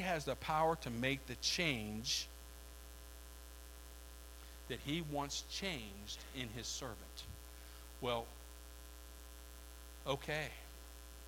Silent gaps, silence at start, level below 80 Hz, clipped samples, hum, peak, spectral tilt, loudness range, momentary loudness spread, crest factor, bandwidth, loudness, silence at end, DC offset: none; 0 s; -56 dBFS; under 0.1%; none; -22 dBFS; -3.5 dB/octave; 8 LU; 18 LU; 22 dB; 17 kHz; -41 LUFS; 0 s; under 0.1%